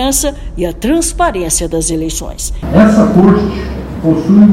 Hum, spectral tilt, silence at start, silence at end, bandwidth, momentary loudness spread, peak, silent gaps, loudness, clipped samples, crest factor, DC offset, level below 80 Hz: none; -5.5 dB/octave; 0 s; 0 s; 16 kHz; 12 LU; 0 dBFS; none; -12 LUFS; 2%; 10 dB; under 0.1%; -24 dBFS